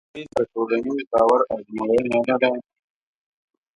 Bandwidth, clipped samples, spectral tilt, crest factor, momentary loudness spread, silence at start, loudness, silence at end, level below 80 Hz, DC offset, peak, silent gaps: 11 kHz; under 0.1%; -6 dB/octave; 18 dB; 8 LU; 0.15 s; -22 LUFS; 1.15 s; -58 dBFS; under 0.1%; -4 dBFS; 1.07-1.11 s